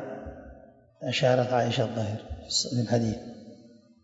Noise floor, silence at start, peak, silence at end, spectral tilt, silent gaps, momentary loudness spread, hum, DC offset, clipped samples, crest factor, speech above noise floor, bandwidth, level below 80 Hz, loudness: -53 dBFS; 0 s; -10 dBFS; 0.35 s; -5 dB/octave; none; 20 LU; none; under 0.1%; under 0.1%; 20 dB; 27 dB; 8 kHz; -52 dBFS; -27 LUFS